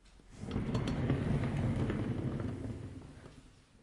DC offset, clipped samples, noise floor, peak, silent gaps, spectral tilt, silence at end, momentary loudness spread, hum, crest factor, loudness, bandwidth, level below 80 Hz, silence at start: under 0.1%; under 0.1%; -59 dBFS; -20 dBFS; none; -8 dB/octave; 0.35 s; 17 LU; none; 16 dB; -36 LUFS; 11.5 kHz; -48 dBFS; 0.05 s